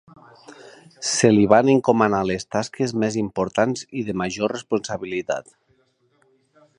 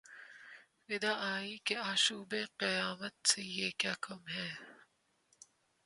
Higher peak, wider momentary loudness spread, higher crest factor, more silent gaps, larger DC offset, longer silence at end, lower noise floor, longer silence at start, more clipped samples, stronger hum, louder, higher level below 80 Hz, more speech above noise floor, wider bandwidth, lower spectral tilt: first, 0 dBFS vs -14 dBFS; second, 12 LU vs 20 LU; about the same, 22 dB vs 26 dB; neither; neither; first, 1.35 s vs 1.1 s; second, -64 dBFS vs -75 dBFS; first, 0.5 s vs 0.05 s; neither; neither; first, -21 LUFS vs -35 LUFS; first, -56 dBFS vs -82 dBFS; first, 44 dB vs 37 dB; about the same, 11 kHz vs 11.5 kHz; first, -5 dB/octave vs -1.5 dB/octave